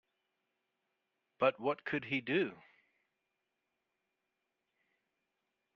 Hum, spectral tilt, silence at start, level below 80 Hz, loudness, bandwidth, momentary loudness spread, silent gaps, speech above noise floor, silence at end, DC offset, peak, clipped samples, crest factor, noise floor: none; -3.5 dB/octave; 1.4 s; -84 dBFS; -35 LUFS; 6.8 kHz; 5 LU; none; 51 dB; 3.2 s; under 0.1%; -16 dBFS; under 0.1%; 26 dB; -87 dBFS